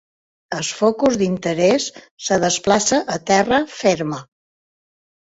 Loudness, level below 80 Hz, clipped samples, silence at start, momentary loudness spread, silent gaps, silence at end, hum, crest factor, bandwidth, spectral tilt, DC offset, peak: -18 LUFS; -54 dBFS; under 0.1%; 0.5 s; 11 LU; 2.11-2.17 s; 1.15 s; none; 18 dB; 8.2 kHz; -3.5 dB/octave; under 0.1%; -2 dBFS